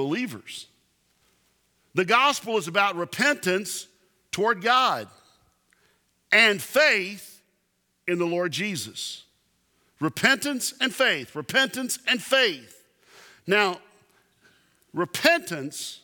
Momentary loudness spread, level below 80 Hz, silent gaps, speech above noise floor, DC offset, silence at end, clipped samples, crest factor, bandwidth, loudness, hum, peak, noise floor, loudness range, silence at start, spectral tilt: 15 LU; -74 dBFS; none; 48 dB; under 0.1%; 0.05 s; under 0.1%; 24 dB; 20 kHz; -23 LUFS; none; -2 dBFS; -72 dBFS; 4 LU; 0 s; -2.5 dB/octave